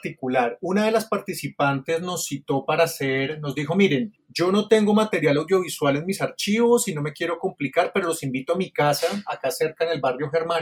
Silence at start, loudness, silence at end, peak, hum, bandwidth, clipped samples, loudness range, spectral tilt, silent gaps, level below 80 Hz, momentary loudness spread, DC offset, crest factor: 0.05 s; -23 LUFS; 0 s; -4 dBFS; none; 18 kHz; under 0.1%; 3 LU; -5 dB/octave; none; -66 dBFS; 8 LU; under 0.1%; 18 dB